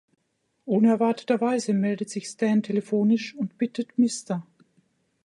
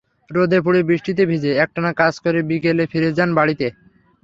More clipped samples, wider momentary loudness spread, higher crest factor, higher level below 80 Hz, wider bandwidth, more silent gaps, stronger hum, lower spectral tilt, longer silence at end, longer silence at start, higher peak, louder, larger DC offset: neither; first, 11 LU vs 4 LU; about the same, 16 dB vs 16 dB; second, -76 dBFS vs -56 dBFS; first, 11.5 kHz vs 7.6 kHz; neither; neither; second, -6 dB/octave vs -7.5 dB/octave; first, 0.8 s vs 0.55 s; first, 0.65 s vs 0.3 s; second, -10 dBFS vs -2 dBFS; second, -25 LUFS vs -18 LUFS; neither